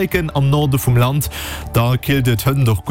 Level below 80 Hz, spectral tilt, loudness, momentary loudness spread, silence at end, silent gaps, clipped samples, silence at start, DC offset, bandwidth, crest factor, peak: -32 dBFS; -6 dB/octave; -16 LUFS; 5 LU; 0 s; none; under 0.1%; 0 s; under 0.1%; 17 kHz; 12 dB; -4 dBFS